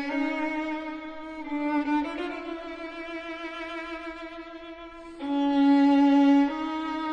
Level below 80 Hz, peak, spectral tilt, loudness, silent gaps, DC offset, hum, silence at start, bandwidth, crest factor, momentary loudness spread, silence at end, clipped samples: -58 dBFS; -12 dBFS; -5 dB/octave; -26 LUFS; none; under 0.1%; none; 0 s; 6.8 kHz; 14 dB; 20 LU; 0 s; under 0.1%